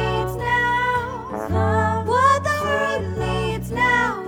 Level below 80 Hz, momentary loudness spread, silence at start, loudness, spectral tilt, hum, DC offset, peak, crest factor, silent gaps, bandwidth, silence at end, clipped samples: -38 dBFS; 8 LU; 0 s; -20 LUFS; -5.5 dB/octave; none; under 0.1%; -4 dBFS; 16 dB; none; 18 kHz; 0 s; under 0.1%